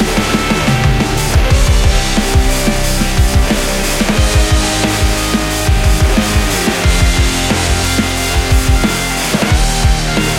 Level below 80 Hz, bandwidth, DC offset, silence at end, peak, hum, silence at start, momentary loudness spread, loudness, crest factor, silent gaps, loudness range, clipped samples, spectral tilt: -16 dBFS; 16.5 kHz; under 0.1%; 0 s; 0 dBFS; none; 0 s; 2 LU; -13 LUFS; 12 dB; none; 0 LU; under 0.1%; -4 dB/octave